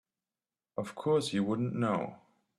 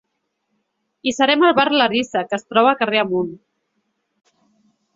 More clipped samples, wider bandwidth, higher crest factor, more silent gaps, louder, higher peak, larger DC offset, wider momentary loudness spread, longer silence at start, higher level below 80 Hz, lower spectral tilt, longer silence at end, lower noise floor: neither; first, 12.5 kHz vs 7.8 kHz; about the same, 18 dB vs 18 dB; neither; second, -33 LUFS vs -17 LUFS; second, -16 dBFS vs -2 dBFS; neither; about the same, 12 LU vs 10 LU; second, 0.75 s vs 1.05 s; second, -72 dBFS vs -64 dBFS; first, -6.5 dB/octave vs -4 dB/octave; second, 0.45 s vs 1.6 s; first, under -90 dBFS vs -74 dBFS